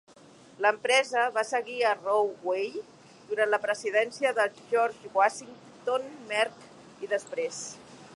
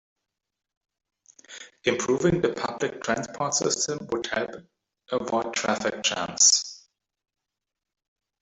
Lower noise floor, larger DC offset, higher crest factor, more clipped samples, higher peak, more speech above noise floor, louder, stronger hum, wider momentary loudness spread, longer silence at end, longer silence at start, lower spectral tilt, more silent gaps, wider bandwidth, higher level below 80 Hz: second, -54 dBFS vs -60 dBFS; neither; second, 18 dB vs 24 dB; neither; second, -10 dBFS vs -4 dBFS; second, 26 dB vs 34 dB; second, -28 LUFS vs -24 LUFS; neither; about the same, 12 LU vs 14 LU; second, 0 s vs 1.65 s; second, 0.6 s vs 1.5 s; about the same, -1.5 dB/octave vs -2 dB/octave; neither; first, 11.5 kHz vs 8.2 kHz; second, -80 dBFS vs -60 dBFS